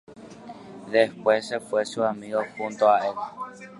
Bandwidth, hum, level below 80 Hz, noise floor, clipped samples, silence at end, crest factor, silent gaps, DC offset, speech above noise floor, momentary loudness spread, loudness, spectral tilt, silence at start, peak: 11.5 kHz; none; -72 dBFS; -43 dBFS; under 0.1%; 0 s; 20 dB; none; under 0.1%; 18 dB; 21 LU; -25 LUFS; -4.5 dB/octave; 0.1 s; -6 dBFS